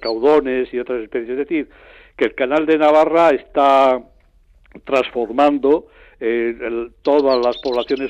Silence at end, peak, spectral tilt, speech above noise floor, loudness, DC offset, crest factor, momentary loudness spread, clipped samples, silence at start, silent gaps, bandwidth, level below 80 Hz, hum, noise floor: 0 s; -4 dBFS; -5.5 dB/octave; 35 dB; -17 LUFS; under 0.1%; 14 dB; 11 LU; under 0.1%; 0 s; none; 8.4 kHz; -50 dBFS; none; -52 dBFS